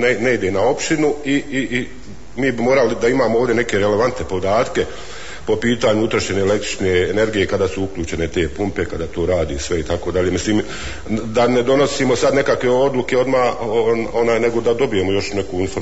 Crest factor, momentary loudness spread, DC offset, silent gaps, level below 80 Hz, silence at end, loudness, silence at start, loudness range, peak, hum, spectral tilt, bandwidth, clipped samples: 14 dB; 8 LU; 3%; none; -40 dBFS; 0 s; -18 LUFS; 0 s; 4 LU; -4 dBFS; none; -5 dB/octave; 8 kHz; under 0.1%